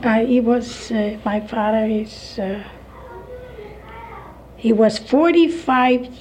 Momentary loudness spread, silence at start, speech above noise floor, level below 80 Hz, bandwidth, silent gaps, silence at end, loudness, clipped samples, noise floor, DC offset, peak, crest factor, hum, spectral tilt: 22 LU; 0 s; 21 dB; -46 dBFS; 10 kHz; none; 0 s; -18 LUFS; under 0.1%; -39 dBFS; under 0.1%; -4 dBFS; 16 dB; none; -6 dB/octave